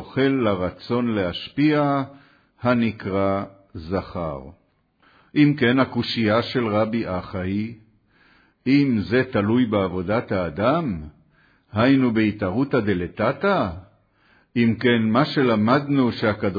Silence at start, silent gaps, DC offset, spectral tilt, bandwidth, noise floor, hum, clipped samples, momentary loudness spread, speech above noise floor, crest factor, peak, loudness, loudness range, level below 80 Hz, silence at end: 0 s; none; under 0.1%; -8.5 dB/octave; 5 kHz; -62 dBFS; none; under 0.1%; 10 LU; 41 dB; 18 dB; -4 dBFS; -22 LUFS; 3 LU; -52 dBFS; 0 s